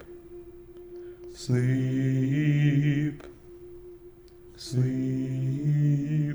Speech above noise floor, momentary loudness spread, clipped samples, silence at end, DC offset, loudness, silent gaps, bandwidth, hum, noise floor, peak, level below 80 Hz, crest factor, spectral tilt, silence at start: 25 dB; 23 LU; under 0.1%; 0 s; under 0.1%; -26 LUFS; none; over 20 kHz; none; -50 dBFS; -12 dBFS; -56 dBFS; 14 dB; -8 dB/octave; 0 s